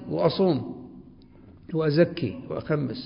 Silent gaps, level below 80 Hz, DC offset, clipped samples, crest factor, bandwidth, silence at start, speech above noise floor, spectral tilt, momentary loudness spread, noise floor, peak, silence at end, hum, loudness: none; -56 dBFS; under 0.1%; under 0.1%; 18 dB; 5.4 kHz; 0 s; 26 dB; -11.5 dB/octave; 16 LU; -50 dBFS; -8 dBFS; 0 s; none; -25 LUFS